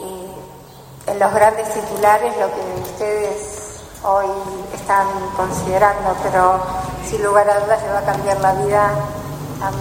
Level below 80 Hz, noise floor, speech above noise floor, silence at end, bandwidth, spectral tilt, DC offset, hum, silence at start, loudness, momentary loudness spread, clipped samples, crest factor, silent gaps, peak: -42 dBFS; -39 dBFS; 22 dB; 0 s; 16.5 kHz; -5 dB/octave; under 0.1%; none; 0 s; -18 LUFS; 14 LU; under 0.1%; 18 dB; none; 0 dBFS